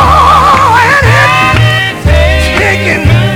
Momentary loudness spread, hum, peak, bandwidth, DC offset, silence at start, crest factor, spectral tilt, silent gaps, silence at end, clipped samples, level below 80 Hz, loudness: 4 LU; none; 0 dBFS; 18 kHz; under 0.1%; 0 s; 6 dB; -5 dB/octave; none; 0 s; 4%; -16 dBFS; -6 LUFS